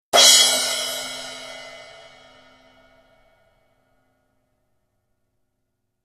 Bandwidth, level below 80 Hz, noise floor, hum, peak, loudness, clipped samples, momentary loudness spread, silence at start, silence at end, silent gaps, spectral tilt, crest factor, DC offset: 14 kHz; -66 dBFS; -75 dBFS; none; 0 dBFS; -14 LUFS; under 0.1%; 27 LU; 0.15 s; 4.3 s; none; 2 dB/octave; 24 dB; under 0.1%